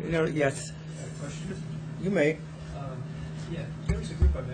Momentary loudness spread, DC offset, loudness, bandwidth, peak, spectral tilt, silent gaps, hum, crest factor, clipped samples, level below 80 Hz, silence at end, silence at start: 12 LU; under 0.1%; -31 LUFS; 9.6 kHz; -12 dBFS; -6.5 dB/octave; none; none; 18 dB; under 0.1%; -36 dBFS; 0 s; 0 s